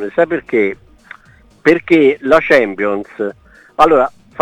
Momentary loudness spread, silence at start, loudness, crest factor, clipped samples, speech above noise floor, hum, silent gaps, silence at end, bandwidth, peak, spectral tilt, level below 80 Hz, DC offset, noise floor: 13 LU; 0 s; -13 LUFS; 14 dB; 0.2%; 34 dB; none; none; 0 s; 11.5 kHz; 0 dBFS; -6 dB/octave; -48 dBFS; under 0.1%; -46 dBFS